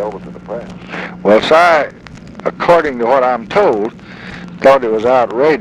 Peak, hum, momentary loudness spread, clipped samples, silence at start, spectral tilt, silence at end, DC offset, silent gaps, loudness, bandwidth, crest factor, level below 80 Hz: 0 dBFS; none; 20 LU; under 0.1%; 0 s; -5.5 dB/octave; 0 s; under 0.1%; none; -12 LUFS; 11 kHz; 12 dB; -46 dBFS